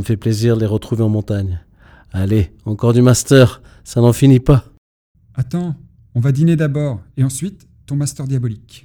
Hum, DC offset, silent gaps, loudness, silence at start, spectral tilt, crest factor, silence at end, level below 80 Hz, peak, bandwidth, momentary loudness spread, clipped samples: none; under 0.1%; 4.78-5.15 s; -16 LUFS; 0 s; -6.5 dB/octave; 16 dB; 0.05 s; -36 dBFS; 0 dBFS; 17.5 kHz; 14 LU; under 0.1%